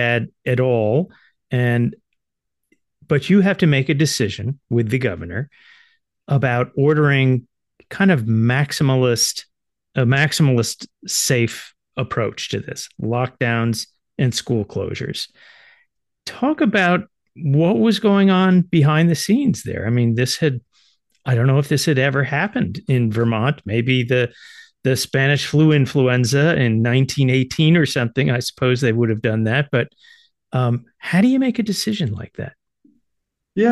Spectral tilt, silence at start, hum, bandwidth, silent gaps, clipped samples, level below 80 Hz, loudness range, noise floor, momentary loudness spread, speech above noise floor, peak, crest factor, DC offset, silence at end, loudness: -5.5 dB/octave; 0 s; none; 12.5 kHz; none; under 0.1%; -54 dBFS; 5 LU; -81 dBFS; 11 LU; 63 dB; -2 dBFS; 16 dB; under 0.1%; 0 s; -18 LUFS